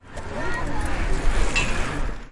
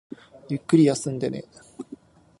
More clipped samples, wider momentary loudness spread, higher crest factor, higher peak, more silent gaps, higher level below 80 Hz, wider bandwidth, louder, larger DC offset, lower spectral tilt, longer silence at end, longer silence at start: neither; second, 8 LU vs 24 LU; second, 14 dB vs 20 dB; about the same, -8 dBFS vs -6 dBFS; neither; first, -26 dBFS vs -64 dBFS; about the same, 11.5 kHz vs 11.5 kHz; second, -27 LUFS vs -23 LUFS; neither; second, -4 dB/octave vs -6.5 dB/octave; second, 0 s vs 0.45 s; second, 0.05 s vs 0.5 s